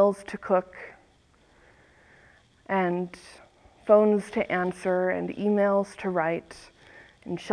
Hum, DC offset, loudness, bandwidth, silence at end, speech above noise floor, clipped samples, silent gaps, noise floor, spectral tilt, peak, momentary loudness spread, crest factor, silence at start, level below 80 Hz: none; under 0.1%; -26 LUFS; 11 kHz; 0 s; 35 dB; under 0.1%; none; -61 dBFS; -7 dB/octave; -6 dBFS; 23 LU; 20 dB; 0 s; -64 dBFS